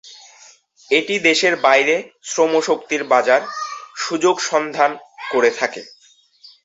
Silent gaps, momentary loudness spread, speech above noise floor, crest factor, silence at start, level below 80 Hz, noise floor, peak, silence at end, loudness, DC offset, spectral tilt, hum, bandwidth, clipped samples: none; 12 LU; 33 dB; 18 dB; 0.05 s; -70 dBFS; -50 dBFS; 0 dBFS; 0.75 s; -17 LUFS; under 0.1%; -2 dB/octave; none; 8.2 kHz; under 0.1%